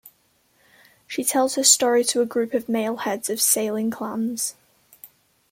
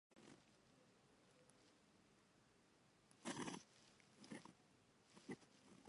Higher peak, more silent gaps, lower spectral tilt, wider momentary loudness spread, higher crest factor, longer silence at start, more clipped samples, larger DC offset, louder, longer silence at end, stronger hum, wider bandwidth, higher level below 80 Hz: first, -2 dBFS vs -36 dBFS; neither; second, -1.5 dB/octave vs -3.5 dB/octave; second, 11 LU vs 17 LU; about the same, 22 dB vs 26 dB; about the same, 0.05 s vs 0.1 s; neither; neither; first, -21 LUFS vs -56 LUFS; first, 0.45 s vs 0 s; neither; first, 16.5 kHz vs 11 kHz; first, -72 dBFS vs under -90 dBFS